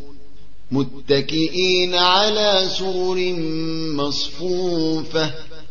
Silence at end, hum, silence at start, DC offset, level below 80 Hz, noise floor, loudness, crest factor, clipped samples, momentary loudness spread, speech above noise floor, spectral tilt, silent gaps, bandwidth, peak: 0.05 s; none; 0 s; 5%; -48 dBFS; -48 dBFS; -19 LUFS; 18 dB; under 0.1%; 9 LU; 28 dB; -4.5 dB/octave; none; 7.2 kHz; -2 dBFS